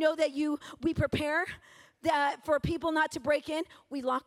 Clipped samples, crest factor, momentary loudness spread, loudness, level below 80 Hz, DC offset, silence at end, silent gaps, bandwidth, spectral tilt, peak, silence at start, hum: under 0.1%; 16 dB; 8 LU; -31 LUFS; -54 dBFS; under 0.1%; 0.05 s; none; 15.5 kHz; -5.5 dB/octave; -14 dBFS; 0 s; none